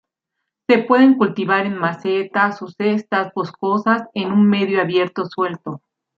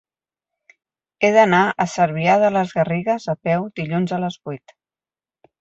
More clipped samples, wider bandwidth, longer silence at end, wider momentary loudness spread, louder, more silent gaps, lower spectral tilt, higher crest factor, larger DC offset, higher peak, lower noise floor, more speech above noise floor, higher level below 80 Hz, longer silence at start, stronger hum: neither; second, 6.4 kHz vs 8.2 kHz; second, 0.4 s vs 1.05 s; about the same, 10 LU vs 11 LU; about the same, -18 LUFS vs -19 LUFS; neither; first, -7.5 dB/octave vs -6 dB/octave; about the same, 16 dB vs 18 dB; neither; about the same, -2 dBFS vs -2 dBFS; second, -79 dBFS vs under -90 dBFS; second, 62 dB vs over 72 dB; second, -68 dBFS vs -62 dBFS; second, 0.7 s vs 1.2 s; neither